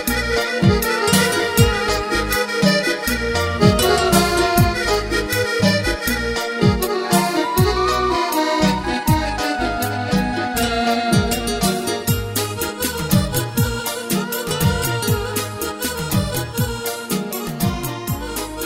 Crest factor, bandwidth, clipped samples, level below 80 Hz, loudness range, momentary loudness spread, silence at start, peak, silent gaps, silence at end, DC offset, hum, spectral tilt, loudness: 18 dB; 16.5 kHz; under 0.1%; -32 dBFS; 4 LU; 7 LU; 0 s; 0 dBFS; none; 0 s; under 0.1%; none; -4.5 dB/octave; -19 LUFS